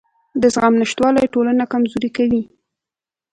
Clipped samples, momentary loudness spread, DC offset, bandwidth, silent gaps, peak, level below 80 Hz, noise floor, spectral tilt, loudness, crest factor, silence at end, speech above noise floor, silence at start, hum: under 0.1%; 6 LU; under 0.1%; 9.4 kHz; none; 0 dBFS; -52 dBFS; -89 dBFS; -5 dB/octave; -17 LUFS; 18 dB; 0.9 s; 73 dB; 0.35 s; none